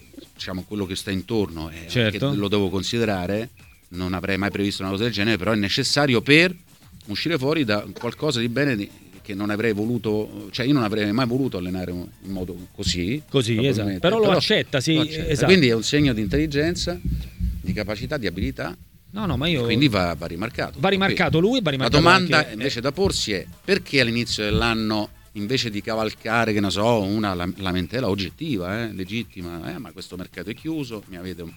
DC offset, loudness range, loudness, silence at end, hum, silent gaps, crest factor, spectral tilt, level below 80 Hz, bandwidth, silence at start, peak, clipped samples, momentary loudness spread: under 0.1%; 6 LU; -22 LUFS; 0 s; none; none; 22 dB; -5 dB/octave; -40 dBFS; 19 kHz; 0.15 s; 0 dBFS; under 0.1%; 14 LU